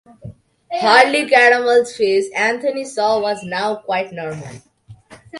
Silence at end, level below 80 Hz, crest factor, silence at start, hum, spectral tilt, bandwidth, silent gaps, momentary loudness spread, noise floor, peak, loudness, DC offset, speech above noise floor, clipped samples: 0 s; -58 dBFS; 18 dB; 0.25 s; none; -3.5 dB/octave; 11.5 kHz; none; 16 LU; -43 dBFS; 0 dBFS; -15 LUFS; under 0.1%; 26 dB; under 0.1%